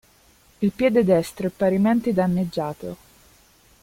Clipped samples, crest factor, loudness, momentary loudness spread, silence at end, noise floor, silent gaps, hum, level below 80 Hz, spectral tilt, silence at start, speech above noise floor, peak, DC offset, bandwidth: under 0.1%; 18 dB; -22 LUFS; 13 LU; 0.9 s; -56 dBFS; none; none; -54 dBFS; -7.5 dB/octave; 0.6 s; 35 dB; -6 dBFS; under 0.1%; 16 kHz